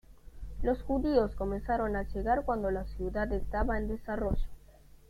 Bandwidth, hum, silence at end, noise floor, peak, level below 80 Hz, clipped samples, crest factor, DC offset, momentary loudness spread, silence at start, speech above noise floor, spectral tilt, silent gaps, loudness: 14 kHz; none; 0.4 s; -56 dBFS; -14 dBFS; -38 dBFS; under 0.1%; 18 dB; under 0.1%; 7 LU; 0.1 s; 25 dB; -8.5 dB/octave; none; -33 LUFS